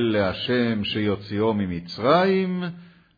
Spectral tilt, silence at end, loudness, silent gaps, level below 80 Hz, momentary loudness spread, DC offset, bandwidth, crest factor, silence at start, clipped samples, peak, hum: -8 dB/octave; 0.3 s; -23 LUFS; none; -54 dBFS; 9 LU; under 0.1%; 5 kHz; 16 dB; 0 s; under 0.1%; -6 dBFS; none